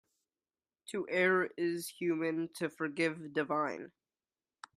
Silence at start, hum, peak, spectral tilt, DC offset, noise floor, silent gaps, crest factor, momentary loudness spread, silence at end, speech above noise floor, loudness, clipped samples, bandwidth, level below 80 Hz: 0.9 s; none; -16 dBFS; -5 dB/octave; under 0.1%; under -90 dBFS; none; 20 dB; 12 LU; 0.85 s; over 56 dB; -34 LUFS; under 0.1%; 15 kHz; -84 dBFS